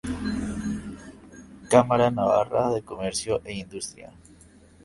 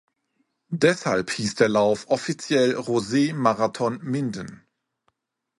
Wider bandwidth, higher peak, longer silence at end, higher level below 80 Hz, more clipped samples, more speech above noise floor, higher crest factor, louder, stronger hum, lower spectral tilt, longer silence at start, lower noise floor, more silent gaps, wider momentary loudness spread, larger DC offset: about the same, 11.5 kHz vs 11.5 kHz; about the same, -2 dBFS vs -4 dBFS; second, 0.75 s vs 1.05 s; first, -48 dBFS vs -62 dBFS; neither; second, 29 dB vs 50 dB; about the same, 24 dB vs 20 dB; about the same, -25 LUFS vs -23 LUFS; neither; about the same, -5 dB/octave vs -5 dB/octave; second, 0.05 s vs 0.7 s; second, -52 dBFS vs -73 dBFS; neither; first, 18 LU vs 7 LU; neither